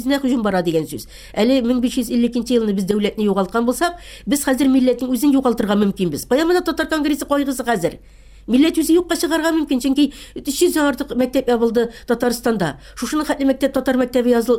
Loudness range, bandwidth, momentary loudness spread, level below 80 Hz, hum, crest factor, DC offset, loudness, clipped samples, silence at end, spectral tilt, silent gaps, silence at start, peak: 2 LU; 17 kHz; 6 LU; -44 dBFS; none; 14 dB; under 0.1%; -18 LUFS; under 0.1%; 0 s; -5 dB/octave; none; 0 s; -4 dBFS